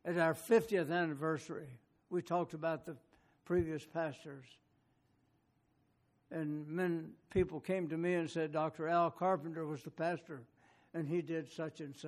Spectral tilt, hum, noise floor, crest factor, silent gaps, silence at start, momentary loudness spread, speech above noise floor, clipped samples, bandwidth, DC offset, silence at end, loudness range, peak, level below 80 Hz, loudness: -6.5 dB/octave; none; -76 dBFS; 20 dB; none; 0.05 s; 14 LU; 39 dB; under 0.1%; 14 kHz; under 0.1%; 0 s; 7 LU; -18 dBFS; -66 dBFS; -38 LUFS